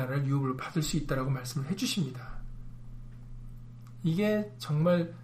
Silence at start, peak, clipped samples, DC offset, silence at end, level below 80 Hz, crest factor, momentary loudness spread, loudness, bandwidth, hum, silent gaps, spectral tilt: 0 s; -14 dBFS; under 0.1%; under 0.1%; 0 s; -46 dBFS; 16 dB; 21 LU; -31 LUFS; 15.5 kHz; none; none; -6 dB/octave